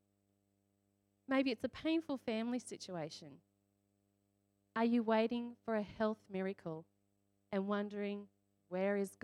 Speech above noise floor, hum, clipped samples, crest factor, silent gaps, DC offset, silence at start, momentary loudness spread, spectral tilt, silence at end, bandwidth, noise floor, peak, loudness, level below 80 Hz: 42 dB; 50 Hz at -75 dBFS; under 0.1%; 18 dB; none; under 0.1%; 1.3 s; 12 LU; -6 dB/octave; 0.1 s; 12.5 kHz; -80 dBFS; -22 dBFS; -39 LUFS; -76 dBFS